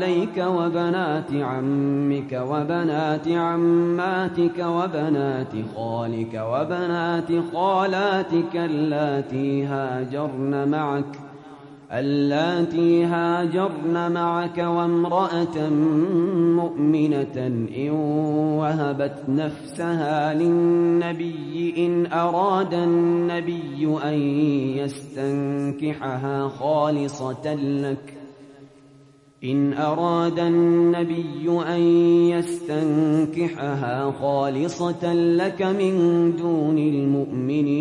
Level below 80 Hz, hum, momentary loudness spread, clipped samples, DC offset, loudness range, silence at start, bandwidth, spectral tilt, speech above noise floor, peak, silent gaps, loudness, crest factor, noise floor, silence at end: -66 dBFS; none; 8 LU; under 0.1%; under 0.1%; 4 LU; 0 s; 11 kHz; -7.5 dB/octave; 30 dB; -8 dBFS; none; -22 LUFS; 14 dB; -52 dBFS; 0 s